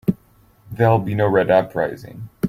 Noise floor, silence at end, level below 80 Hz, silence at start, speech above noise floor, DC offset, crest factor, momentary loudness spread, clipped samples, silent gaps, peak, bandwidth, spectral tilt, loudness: -54 dBFS; 0 s; -50 dBFS; 0.05 s; 36 dB; under 0.1%; 16 dB; 19 LU; under 0.1%; none; -2 dBFS; 15.5 kHz; -8.5 dB/octave; -18 LUFS